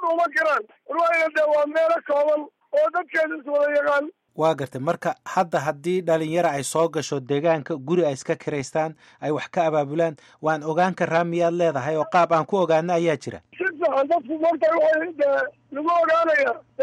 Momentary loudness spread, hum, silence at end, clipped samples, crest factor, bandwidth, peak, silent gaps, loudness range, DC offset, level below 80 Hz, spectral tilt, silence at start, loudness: 7 LU; none; 0 s; under 0.1%; 14 dB; 13.5 kHz; -8 dBFS; none; 3 LU; under 0.1%; -70 dBFS; -5.5 dB/octave; 0 s; -22 LUFS